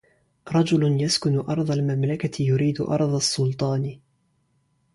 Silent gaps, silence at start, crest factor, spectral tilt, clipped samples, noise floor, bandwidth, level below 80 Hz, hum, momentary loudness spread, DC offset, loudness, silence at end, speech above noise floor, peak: none; 0.45 s; 16 dB; -5.5 dB/octave; under 0.1%; -68 dBFS; 11.5 kHz; -58 dBFS; none; 5 LU; under 0.1%; -23 LUFS; 0.95 s; 45 dB; -8 dBFS